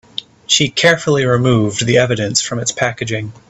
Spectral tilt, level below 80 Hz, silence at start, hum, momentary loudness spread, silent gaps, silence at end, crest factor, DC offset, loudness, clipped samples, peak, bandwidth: -4 dB/octave; -48 dBFS; 0.2 s; none; 10 LU; none; 0.2 s; 16 dB; under 0.1%; -14 LUFS; under 0.1%; 0 dBFS; 9.8 kHz